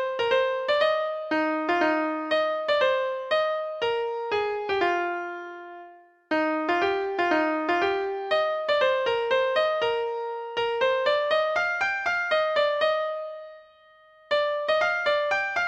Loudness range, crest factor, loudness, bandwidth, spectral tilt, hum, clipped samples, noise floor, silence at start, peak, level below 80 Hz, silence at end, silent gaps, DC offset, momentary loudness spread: 3 LU; 16 dB; -25 LUFS; 8.6 kHz; -3.5 dB/octave; none; under 0.1%; -55 dBFS; 0 s; -10 dBFS; -66 dBFS; 0 s; none; under 0.1%; 7 LU